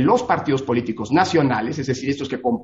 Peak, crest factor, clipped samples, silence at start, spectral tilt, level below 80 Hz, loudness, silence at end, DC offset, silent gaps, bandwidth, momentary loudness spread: -2 dBFS; 16 dB; under 0.1%; 0 s; -6 dB/octave; -54 dBFS; -20 LUFS; 0 s; under 0.1%; none; 8 kHz; 6 LU